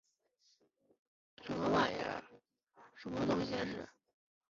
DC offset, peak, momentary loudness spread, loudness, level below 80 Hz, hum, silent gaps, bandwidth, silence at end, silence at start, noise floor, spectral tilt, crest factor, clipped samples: under 0.1%; -20 dBFS; 18 LU; -37 LUFS; -66 dBFS; none; none; 7.6 kHz; 0.7 s; 1.4 s; -76 dBFS; -4 dB/octave; 22 dB; under 0.1%